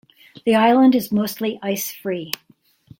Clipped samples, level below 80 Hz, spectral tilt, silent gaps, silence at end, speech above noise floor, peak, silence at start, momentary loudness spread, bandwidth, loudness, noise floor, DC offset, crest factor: under 0.1%; -62 dBFS; -5 dB/octave; none; 0.7 s; 39 dB; 0 dBFS; 0.45 s; 13 LU; 17 kHz; -19 LUFS; -57 dBFS; under 0.1%; 20 dB